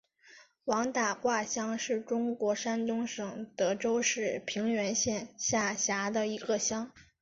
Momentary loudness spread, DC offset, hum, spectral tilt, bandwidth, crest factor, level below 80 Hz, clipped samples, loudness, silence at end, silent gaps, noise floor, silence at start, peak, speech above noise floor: 5 LU; under 0.1%; none; -2.5 dB/octave; 7.8 kHz; 16 dB; -68 dBFS; under 0.1%; -32 LUFS; 0.2 s; none; -59 dBFS; 0.25 s; -16 dBFS; 27 dB